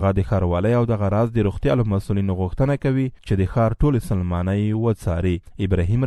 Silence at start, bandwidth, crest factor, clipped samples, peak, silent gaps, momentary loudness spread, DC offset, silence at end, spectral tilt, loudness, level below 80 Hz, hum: 0 s; 12.5 kHz; 14 dB; under 0.1%; -6 dBFS; none; 4 LU; under 0.1%; 0 s; -9 dB/octave; -21 LUFS; -34 dBFS; none